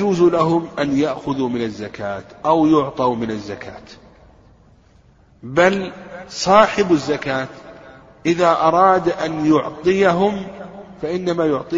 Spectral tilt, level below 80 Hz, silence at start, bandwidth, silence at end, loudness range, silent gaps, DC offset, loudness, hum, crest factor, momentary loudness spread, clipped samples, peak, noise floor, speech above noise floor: -6 dB/octave; -50 dBFS; 0 s; 8 kHz; 0 s; 5 LU; none; under 0.1%; -18 LUFS; none; 18 dB; 17 LU; under 0.1%; 0 dBFS; -51 dBFS; 34 dB